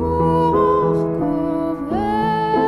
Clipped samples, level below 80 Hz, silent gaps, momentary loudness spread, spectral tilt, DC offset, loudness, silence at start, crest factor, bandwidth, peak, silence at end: under 0.1%; -40 dBFS; none; 6 LU; -9 dB/octave; under 0.1%; -18 LUFS; 0 s; 14 dB; 12 kHz; -4 dBFS; 0 s